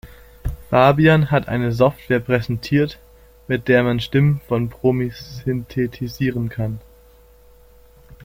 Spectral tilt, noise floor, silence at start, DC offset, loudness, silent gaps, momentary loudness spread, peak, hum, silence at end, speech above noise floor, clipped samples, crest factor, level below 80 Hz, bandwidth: -8 dB/octave; -49 dBFS; 0.05 s; under 0.1%; -19 LUFS; none; 13 LU; -2 dBFS; none; 1.45 s; 31 dB; under 0.1%; 18 dB; -40 dBFS; 16 kHz